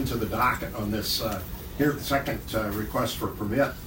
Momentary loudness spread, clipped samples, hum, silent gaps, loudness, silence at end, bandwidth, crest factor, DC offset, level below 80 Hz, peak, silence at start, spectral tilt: 6 LU; under 0.1%; none; none; -28 LUFS; 0 s; 16.5 kHz; 18 dB; under 0.1%; -42 dBFS; -10 dBFS; 0 s; -5 dB/octave